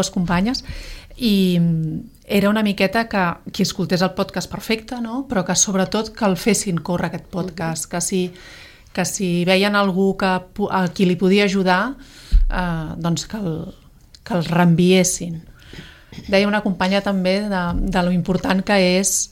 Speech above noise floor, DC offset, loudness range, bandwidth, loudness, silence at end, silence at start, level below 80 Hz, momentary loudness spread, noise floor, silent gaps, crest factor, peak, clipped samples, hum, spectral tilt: 21 dB; under 0.1%; 3 LU; 16.5 kHz; -19 LUFS; 0.05 s; 0 s; -32 dBFS; 12 LU; -40 dBFS; none; 16 dB; -4 dBFS; under 0.1%; none; -4.5 dB/octave